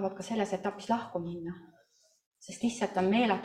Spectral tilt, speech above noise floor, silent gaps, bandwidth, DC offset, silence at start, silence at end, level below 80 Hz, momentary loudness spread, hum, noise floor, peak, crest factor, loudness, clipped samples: -5.5 dB/octave; 36 dB; 2.26-2.32 s; 11.5 kHz; under 0.1%; 0 s; 0 s; -70 dBFS; 18 LU; none; -68 dBFS; -14 dBFS; 20 dB; -32 LUFS; under 0.1%